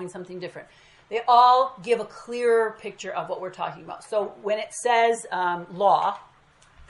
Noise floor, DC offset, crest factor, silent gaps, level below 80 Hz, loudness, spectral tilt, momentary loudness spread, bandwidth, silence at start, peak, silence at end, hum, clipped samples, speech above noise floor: -57 dBFS; under 0.1%; 20 dB; none; -66 dBFS; -23 LUFS; -3.5 dB/octave; 18 LU; 11.5 kHz; 0 s; -4 dBFS; 0.7 s; none; under 0.1%; 33 dB